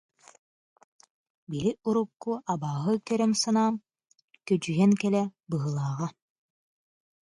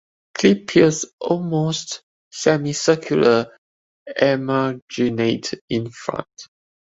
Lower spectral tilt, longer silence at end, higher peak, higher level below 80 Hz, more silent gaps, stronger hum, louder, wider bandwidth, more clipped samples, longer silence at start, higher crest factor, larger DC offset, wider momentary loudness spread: about the same, -6 dB/octave vs -5 dB/octave; first, 1.1 s vs 0.5 s; second, -12 dBFS vs -2 dBFS; second, -68 dBFS vs -58 dBFS; second, 4.24-4.28 s vs 1.13-1.18 s, 2.03-2.31 s, 3.58-4.06 s, 4.82-4.88 s, 5.61-5.68 s; neither; second, -28 LUFS vs -20 LUFS; first, 11.5 kHz vs 8 kHz; neither; first, 1.5 s vs 0.35 s; about the same, 18 dB vs 18 dB; neither; second, 11 LU vs 15 LU